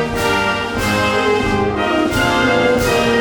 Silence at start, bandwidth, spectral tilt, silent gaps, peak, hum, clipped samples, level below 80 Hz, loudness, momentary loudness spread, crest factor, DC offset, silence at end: 0 s; over 20 kHz; -4.5 dB/octave; none; -2 dBFS; none; under 0.1%; -34 dBFS; -15 LUFS; 3 LU; 14 dB; under 0.1%; 0 s